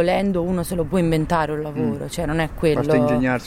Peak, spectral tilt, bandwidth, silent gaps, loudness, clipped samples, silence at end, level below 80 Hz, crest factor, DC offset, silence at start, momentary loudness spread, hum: -6 dBFS; -6.5 dB/octave; 16 kHz; none; -21 LUFS; under 0.1%; 0 s; -36 dBFS; 14 dB; under 0.1%; 0 s; 6 LU; none